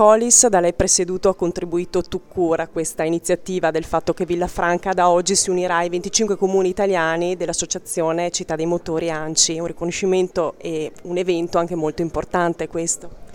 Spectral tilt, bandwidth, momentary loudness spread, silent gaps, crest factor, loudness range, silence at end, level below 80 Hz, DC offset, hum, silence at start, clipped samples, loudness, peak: -3 dB/octave; 18 kHz; 8 LU; none; 20 dB; 3 LU; 0 s; -44 dBFS; under 0.1%; none; 0 s; under 0.1%; -19 LUFS; 0 dBFS